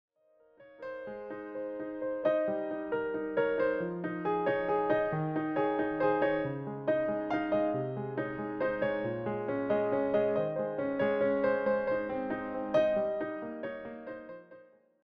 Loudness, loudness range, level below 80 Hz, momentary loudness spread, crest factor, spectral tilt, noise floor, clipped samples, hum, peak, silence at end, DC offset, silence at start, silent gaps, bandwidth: -32 LUFS; 3 LU; -64 dBFS; 12 LU; 16 dB; -5.5 dB/octave; -66 dBFS; under 0.1%; none; -16 dBFS; 0.45 s; under 0.1%; 0.6 s; none; 6.2 kHz